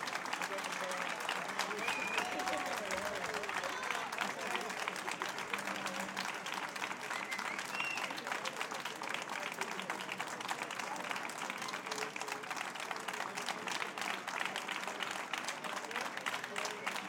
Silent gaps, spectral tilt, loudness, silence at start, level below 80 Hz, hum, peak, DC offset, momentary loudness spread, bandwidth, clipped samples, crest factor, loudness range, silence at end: none; -1.5 dB/octave; -39 LUFS; 0 s; -80 dBFS; none; -18 dBFS; under 0.1%; 4 LU; 18 kHz; under 0.1%; 22 dB; 3 LU; 0 s